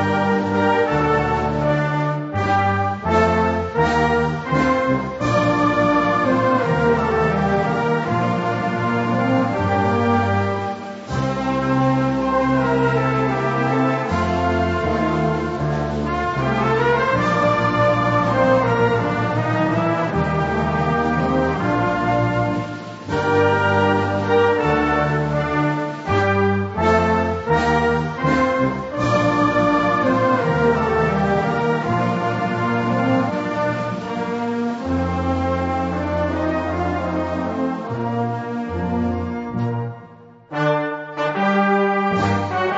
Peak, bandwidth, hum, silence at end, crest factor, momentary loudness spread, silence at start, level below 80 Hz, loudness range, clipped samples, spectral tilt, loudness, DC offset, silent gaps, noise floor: -4 dBFS; 8 kHz; none; 0 s; 16 dB; 6 LU; 0 s; -40 dBFS; 4 LU; under 0.1%; -7 dB/octave; -19 LUFS; under 0.1%; none; -43 dBFS